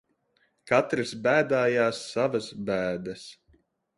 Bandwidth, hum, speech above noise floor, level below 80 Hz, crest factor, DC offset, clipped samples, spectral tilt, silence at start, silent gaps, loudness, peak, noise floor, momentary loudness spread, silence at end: 11.5 kHz; none; 44 dB; -64 dBFS; 20 dB; under 0.1%; under 0.1%; -5 dB/octave; 0.65 s; none; -26 LUFS; -8 dBFS; -70 dBFS; 13 LU; 0.65 s